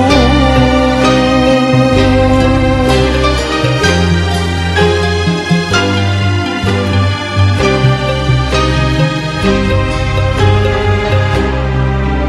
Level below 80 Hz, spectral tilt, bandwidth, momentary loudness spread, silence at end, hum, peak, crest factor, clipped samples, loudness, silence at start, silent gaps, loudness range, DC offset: -20 dBFS; -6 dB/octave; 12 kHz; 4 LU; 0 s; none; 0 dBFS; 10 dB; under 0.1%; -11 LUFS; 0 s; none; 2 LU; under 0.1%